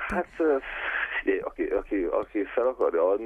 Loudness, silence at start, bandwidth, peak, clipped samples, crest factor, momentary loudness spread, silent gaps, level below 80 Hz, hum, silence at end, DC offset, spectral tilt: -27 LUFS; 0 s; 10.5 kHz; -12 dBFS; under 0.1%; 14 dB; 5 LU; none; -50 dBFS; none; 0 s; under 0.1%; -6.5 dB/octave